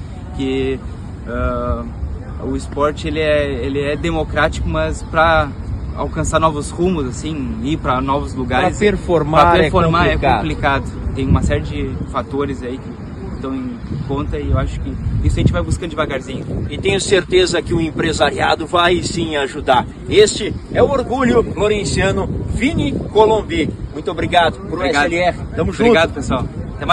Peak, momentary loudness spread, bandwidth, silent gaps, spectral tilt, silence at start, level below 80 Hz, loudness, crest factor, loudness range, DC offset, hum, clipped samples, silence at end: 0 dBFS; 11 LU; 11.5 kHz; none; -5.5 dB/octave; 0 s; -28 dBFS; -17 LUFS; 16 dB; 6 LU; under 0.1%; none; under 0.1%; 0 s